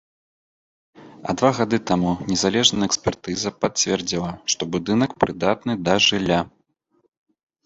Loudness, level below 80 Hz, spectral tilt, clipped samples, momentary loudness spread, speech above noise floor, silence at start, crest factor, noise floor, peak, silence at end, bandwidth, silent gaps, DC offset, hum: -21 LUFS; -50 dBFS; -3.5 dB/octave; under 0.1%; 9 LU; 45 dB; 1 s; 22 dB; -66 dBFS; -2 dBFS; 1.15 s; 8.2 kHz; none; under 0.1%; none